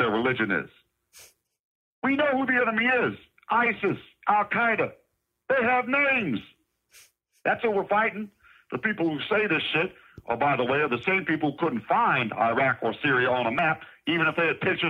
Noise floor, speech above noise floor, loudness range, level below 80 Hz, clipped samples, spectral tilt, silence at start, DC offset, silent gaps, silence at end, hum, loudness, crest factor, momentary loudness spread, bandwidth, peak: -58 dBFS; 33 dB; 3 LU; -66 dBFS; under 0.1%; -6.5 dB/octave; 0 s; under 0.1%; 1.59-2.02 s; 0 s; none; -25 LUFS; 18 dB; 8 LU; 15 kHz; -8 dBFS